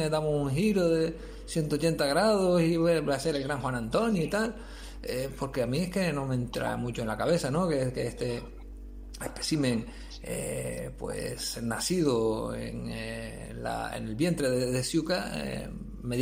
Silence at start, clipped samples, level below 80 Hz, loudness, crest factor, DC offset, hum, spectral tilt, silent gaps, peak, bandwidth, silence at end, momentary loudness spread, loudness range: 0 s; under 0.1%; -46 dBFS; -30 LUFS; 18 dB; under 0.1%; none; -5.5 dB/octave; none; -12 dBFS; 16 kHz; 0 s; 14 LU; 6 LU